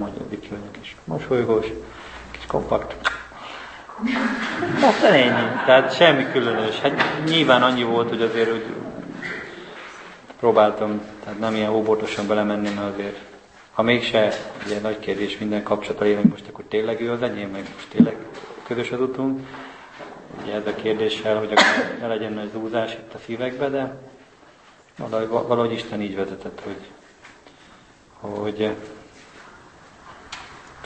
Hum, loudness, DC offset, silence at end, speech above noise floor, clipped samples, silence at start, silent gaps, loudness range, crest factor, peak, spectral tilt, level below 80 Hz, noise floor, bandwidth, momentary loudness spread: none; -21 LUFS; under 0.1%; 0 s; 30 dB; under 0.1%; 0 s; none; 11 LU; 22 dB; 0 dBFS; -5 dB/octave; -54 dBFS; -51 dBFS; 8.8 kHz; 21 LU